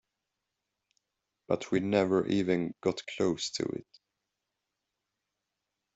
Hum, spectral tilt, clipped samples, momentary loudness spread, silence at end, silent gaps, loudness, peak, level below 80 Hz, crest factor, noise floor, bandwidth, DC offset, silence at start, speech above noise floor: none; -5.5 dB/octave; under 0.1%; 8 LU; 2.15 s; none; -31 LUFS; -14 dBFS; -70 dBFS; 20 dB; -86 dBFS; 8.2 kHz; under 0.1%; 1.5 s; 56 dB